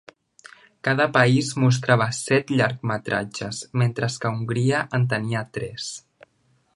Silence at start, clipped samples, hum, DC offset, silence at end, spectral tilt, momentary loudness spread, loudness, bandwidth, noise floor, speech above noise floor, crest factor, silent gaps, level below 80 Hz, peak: 0.85 s; under 0.1%; none; under 0.1%; 0.75 s; -5.5 dB/octave; 12 LU; -23 LUFS; 11.5 kHz; -65 dBFS; 43 dB; 22 dB; none; -60 dBFS; -2 dBFS